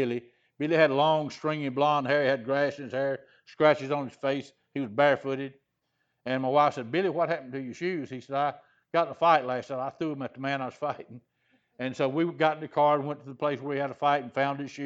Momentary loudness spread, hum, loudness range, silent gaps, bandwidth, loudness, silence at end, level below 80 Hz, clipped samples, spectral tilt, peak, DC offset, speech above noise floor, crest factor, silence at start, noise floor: 11 LU; none; 3 LU; none; 7.8 kHz; -28 LUFS; 0 s; -78 dBFS; under 0.1%; -6.5 dB/octave; -6 dBFS; under 0.1%; 50 dB; 22 dB; 0 s; -78 dBFS